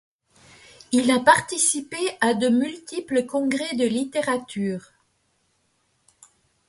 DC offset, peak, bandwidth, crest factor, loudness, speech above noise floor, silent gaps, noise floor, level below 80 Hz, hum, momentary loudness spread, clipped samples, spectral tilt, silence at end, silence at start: under 0.1%; -4 dBFS; 11.5 kHz; 22 dB; -22 LUFS; 46 dB; none; -69 dBFS; -66 dBFS; none; 11 LU; under 0.1%; -3 dB/octave; 1.9 s; 0.9 s